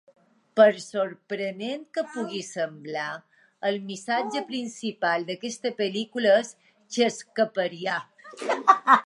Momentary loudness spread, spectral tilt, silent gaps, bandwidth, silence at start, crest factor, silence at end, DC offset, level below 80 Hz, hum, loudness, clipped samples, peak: 13 LU; -3.5 dB/octave; none; 11.5 kHz; 0.55 s; 24 dB; 0 s; under 0.1%; -84 dBFS; none; -26 LUFS; under 0.1%; -2 dBFS